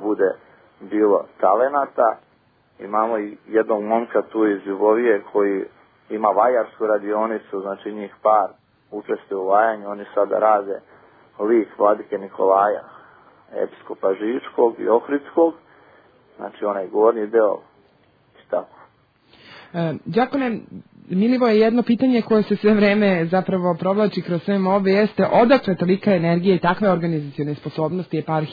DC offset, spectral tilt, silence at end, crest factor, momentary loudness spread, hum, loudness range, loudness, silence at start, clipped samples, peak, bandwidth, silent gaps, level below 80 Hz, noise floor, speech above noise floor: under 0.1%; -9.5 dB/octave; 0 s; 18 dB; 12 LU; none; 5 LU; -20 LUFS; 0 s; under 0.1%; -2 dBFS; 5 kHz; none; -62 dBFS; -59 dBFS; 40 dB